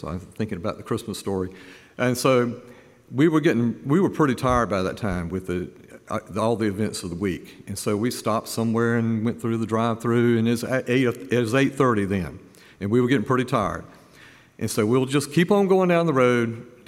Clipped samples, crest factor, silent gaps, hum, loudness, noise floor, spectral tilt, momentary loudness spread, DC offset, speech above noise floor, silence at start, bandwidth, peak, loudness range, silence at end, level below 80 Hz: under 0.1%; 18 dB; none; none; -23 LUFS; -50 dBFS; -6 dB/octave; 11 LU; under 0.1%; 28 dB; 0 s; 16 kHz; -6 dBFS; 4 LU; 0.2 s; -50 dBFS